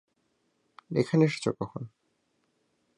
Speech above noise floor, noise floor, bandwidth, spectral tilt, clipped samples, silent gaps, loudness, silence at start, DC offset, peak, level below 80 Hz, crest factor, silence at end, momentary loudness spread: 47 dB; -74 dBFS; 11 kHz; -7 dB/octave; under 0.1%; none; -28 LUFS; 0.9 s; under 0.1%; -10 dBFS; -68 dBFS; 22 dB; 1.1 s; 17 LU